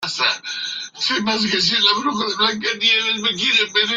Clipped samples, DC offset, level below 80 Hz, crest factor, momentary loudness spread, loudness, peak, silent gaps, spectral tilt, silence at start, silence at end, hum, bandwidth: under 0.1%; under 0.1%; -62 dBFS; 18 dB; 8 LU; -17 LUFS; -2 dBFS; none; -2 dB/octave; 0 s; 0 s; none; 13 kHz